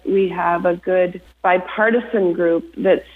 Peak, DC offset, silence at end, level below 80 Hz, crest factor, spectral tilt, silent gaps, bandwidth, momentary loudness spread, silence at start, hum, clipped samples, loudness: -4 dBFS; under 0.1%; 0.1 s; -52 dBFS; 14 dB; -8.5 dB/octave; none; 4.3 kHz; 3 LU; 0.05 s; none; under 0.1%; -18 LUFS